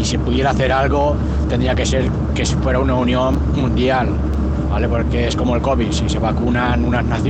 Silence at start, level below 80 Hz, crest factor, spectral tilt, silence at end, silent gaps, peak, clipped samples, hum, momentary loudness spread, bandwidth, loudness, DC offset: 0 s; -22 dBFS; 12 dB; -6 dB/octave; 0 s; none; -4 dBFS; under 0.1%; none; 3 LU; 8.8 kHz; -17 LUFS; under 0.1%